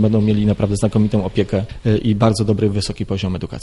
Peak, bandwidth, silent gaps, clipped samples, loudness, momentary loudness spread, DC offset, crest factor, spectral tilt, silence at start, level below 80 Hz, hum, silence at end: -2 dBFS; 11.5 kHz; none; under 0.1%; -18 LUFS; 7 LU; under 0.1%; 14 dB; -7 dB/octave; 0 s; -36 dBFS; none; 0 s